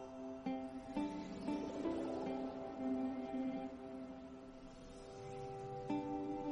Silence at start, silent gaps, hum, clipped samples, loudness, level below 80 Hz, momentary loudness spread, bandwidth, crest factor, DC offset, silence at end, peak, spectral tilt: 0 s; none; none; under 0.1%; -45 LUFS; -66 dBFS; 12 LU; 10.5 kHz; 16 dB; under 0.1%; 0 s; -28 dBFS; -7 dB/octave